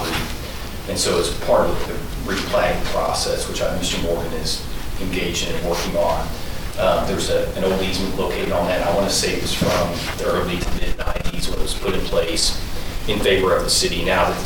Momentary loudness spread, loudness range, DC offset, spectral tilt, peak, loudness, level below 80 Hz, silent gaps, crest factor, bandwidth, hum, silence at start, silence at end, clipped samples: 9 LU; 3 LU; under 0.1%; -3.5 dB/octave; -6 dBFS; -21 LUFS; -28 dBFS; none; 14 dB; 19 kHz; none; 0 s; 0 s; under 0.1%